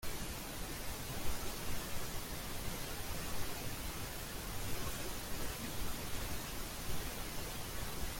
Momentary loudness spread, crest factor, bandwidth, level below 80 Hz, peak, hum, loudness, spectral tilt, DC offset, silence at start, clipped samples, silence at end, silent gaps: 2 LU; 16 dB; 17 kHz; -48 dBFS; -22 dBFS; none; -43 LUFS; -3 dB/octave; under 0.1%; 0 s; under 0.1%; 0 s; none